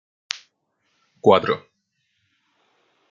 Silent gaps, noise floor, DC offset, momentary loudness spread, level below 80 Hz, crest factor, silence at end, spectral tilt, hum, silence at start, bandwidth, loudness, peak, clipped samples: none; -72 dBFS; under 0.1%; 15 LU; -70 dBFS; 24 dB; 1.55 s; -5 dB/octave; none; 0.35 s; 7.4 kHz; -21 LUFS; 0 dBFS; under 0.1%